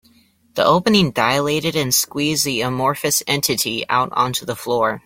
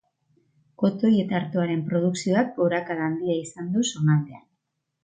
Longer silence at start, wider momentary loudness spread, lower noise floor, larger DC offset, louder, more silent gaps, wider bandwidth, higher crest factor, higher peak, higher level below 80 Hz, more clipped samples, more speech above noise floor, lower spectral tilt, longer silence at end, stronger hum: second, 0.55 s vs 0.8 s; about the same, 5 LU vs 6 LU; second, -55 dBFS vs -78 dBFS; neither; first, -18 LUFS vs -24 LUFS; neither; first, 16.5 kHz vs 9.4 kHz; about the same, 18 dB vs 14 dB; first, -2 dBFS vs -10 dBFS; first, -52 dBFS vs -68 dBFS; neither; second, 36 dB vs 55 dB; second, -3.5 dB/octave vs -6.5 dB/octave; second, 0.05 s vs 0.65 s; neither